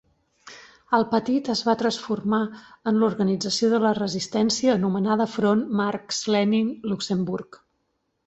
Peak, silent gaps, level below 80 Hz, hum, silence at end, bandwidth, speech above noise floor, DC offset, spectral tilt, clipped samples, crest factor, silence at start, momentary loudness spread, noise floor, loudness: -6 dBFS; none; -62 dBFS; none; 0.85 s; 8.2 kHz; 51 dB; under 0.1%; -5 dB/octave; under 0.1%; 18 dB; 0.45 s; 6 LU; -74 dBFS; -23 LUFS